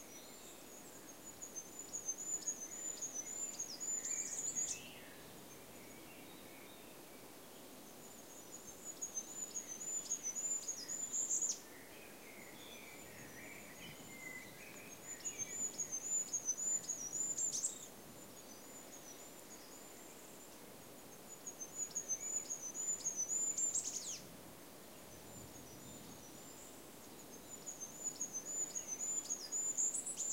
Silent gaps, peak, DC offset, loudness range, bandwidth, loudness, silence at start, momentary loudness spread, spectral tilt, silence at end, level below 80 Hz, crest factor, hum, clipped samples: none; -26 dBFS; under 0.1%; 14 LU; 16 kHz; -41 LUFS; 0 s; 18 LU; -0.5 dB/octave; 0 s; -78 dBFS; 20 dB; none; under 0.1%